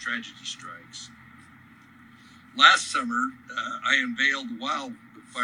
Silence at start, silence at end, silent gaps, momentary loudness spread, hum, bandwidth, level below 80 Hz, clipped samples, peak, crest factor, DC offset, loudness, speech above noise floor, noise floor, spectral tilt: 0 s; 0 s; none; 24 LU; none; 11.5 kHz; -74 dBFS; under 0.1%; -2 dBFS; 24 dB; under 0.1%; -23 LUFS; 26 dB; -52 dBFS; -0.5 dB/octave